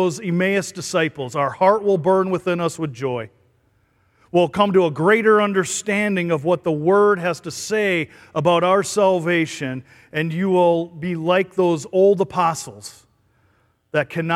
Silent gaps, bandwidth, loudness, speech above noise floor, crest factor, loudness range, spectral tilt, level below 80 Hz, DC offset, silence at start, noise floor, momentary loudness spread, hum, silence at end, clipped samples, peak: none; 14.5 kHz; -19 LUFS; 43 dB; 18 dB; 3 LU; -5 dB/octave; -62 dBFS; under 0.1%; 0 s; -61 dBFS; 10 LU; none; 0 s; under 0.1%; -2 dBFS